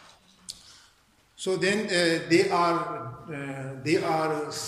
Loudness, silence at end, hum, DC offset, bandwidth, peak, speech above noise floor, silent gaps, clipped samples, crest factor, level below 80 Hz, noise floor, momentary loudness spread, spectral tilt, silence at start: -26 LUFS; 0 s; none; under 0.1%; 14 kHz; -8 dBFS; 36 dB; none; under 0.1%; 18 dB; -68 dBFS; -62 dBFS; 17 LU; -4.5 dB/octave; 0.5 s